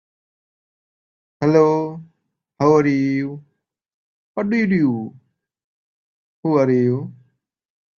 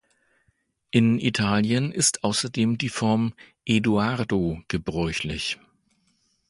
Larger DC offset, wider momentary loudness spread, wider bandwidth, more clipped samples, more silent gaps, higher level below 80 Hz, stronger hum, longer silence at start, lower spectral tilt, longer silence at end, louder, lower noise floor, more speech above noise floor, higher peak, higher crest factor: neither; first, 16 LU vs 8 LU; second, 7 kHz vs 11.5 kHz; neither; first, 3.94-4.35 s, 5.64-6.43 s vs none; second, -62 dBFS vs -48 dBFS; neither; first, 1.4 s vs 0.95 s; first, -8.5 dB/octave vs -4.5 dB/octave; about the same, 0.85 s vs 0.95 s; first, -19 LUFS vs -24 LUFS; about the same, -71 dBFS vs -70 dBFS; first, 53 dB vs 46 dB; first, -2 dBFS vs -6 dBFS; about the same, 20 dB vs 20 dB